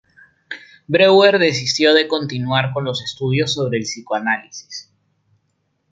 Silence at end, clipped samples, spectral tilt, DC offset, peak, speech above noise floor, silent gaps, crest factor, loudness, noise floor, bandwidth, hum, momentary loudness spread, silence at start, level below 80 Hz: 1.1 s; under 0.1%; -4.5 dB/octave; under 0.1%; -2 dBFS; 51 dB; none; 18 dB; -16 LUFS; -68 dBFS; 9 kHz; none; 22 LU; 0.5 s; -62 dBFS